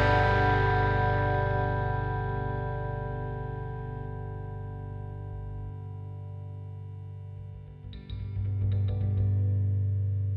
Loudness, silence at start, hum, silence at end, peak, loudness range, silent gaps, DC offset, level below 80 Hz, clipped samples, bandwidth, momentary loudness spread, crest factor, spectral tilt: -30 LUFS; 0 s; none; 0 s; -12 dBFS; 12 LU; none; under 0.1%; -40 dBFS; under 0.1%; 5.4 kHz; 17 LU; 18 dB; -8.5 dB/octave